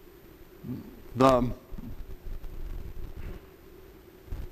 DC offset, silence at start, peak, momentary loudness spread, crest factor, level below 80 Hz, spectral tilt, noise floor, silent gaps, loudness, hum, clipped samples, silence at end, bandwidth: under 0.1%; 0 s; -4 dBFS; 29 LU; 28 dB; -42 dBFS; -7 dB/octave; -51 dBFS; none; -27 LUFS; none; under 0.1%; 0 s; 15.5 kHz